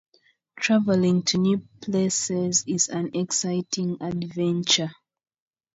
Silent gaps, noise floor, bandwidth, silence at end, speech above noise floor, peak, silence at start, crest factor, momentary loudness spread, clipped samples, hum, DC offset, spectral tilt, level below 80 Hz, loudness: none; -52 dBFS; 8 kHz; 0.85 s; 29 dB; -8 dBFS; 0.55 s; 18 dB; 8 LU; under 0.1%; none; under 0.1%; -4 dB/octave; -64 dBFS; -23 LUFS